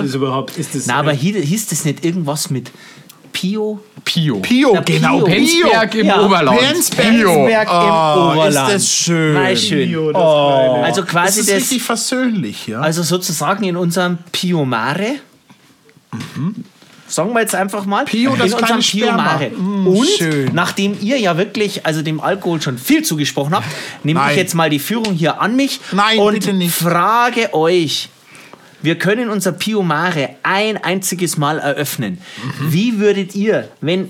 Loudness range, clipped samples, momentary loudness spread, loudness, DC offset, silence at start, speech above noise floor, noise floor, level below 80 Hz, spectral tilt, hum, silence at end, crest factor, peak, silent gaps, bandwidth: 7 LU; under 0.1%; 9 LU; -14 LUFS; under 0.1%; 0 s; 34 dB; -49 dBFS; -58 dBFS; -4 dB/octave; none; 0 s; 12 dB; -2 dBFS; none; 18 kHz